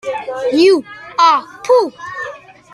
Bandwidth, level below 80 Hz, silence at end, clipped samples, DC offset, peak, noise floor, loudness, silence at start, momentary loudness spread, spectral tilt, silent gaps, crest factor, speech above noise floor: 12 kHz; -62 dBFS; 0.35 s; under 0.1%; under 0.1%; -2 dBFS; -32 dBFS; -14 LUFS; 0.05 s; 14 LU; -3.5 dB/octave; none; 14 dB; 20 dB